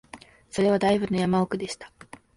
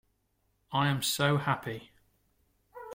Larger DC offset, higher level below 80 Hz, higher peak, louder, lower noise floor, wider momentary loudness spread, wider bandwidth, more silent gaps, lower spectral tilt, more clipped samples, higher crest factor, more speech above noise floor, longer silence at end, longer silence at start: neither; first, -56 dBFS vs -66 dBFS; first, -10 dBFS vs -14 dBFS; first, -25 LUFS vs -29 LUFS; second, -48 dBFS vs -75 dBFS; about the same, 15 LU vs 16 LU; second, 11.5 kHz vs 16.5 kHz; neither; first, -6 dB/octave vs -4.5 dB/octave; neither; about the same, 16 dB vs 20 dB; second, 24 dB vs 46 dB; first, 0.5 s vs 0 s; second, 0.15 s vs 0.7 s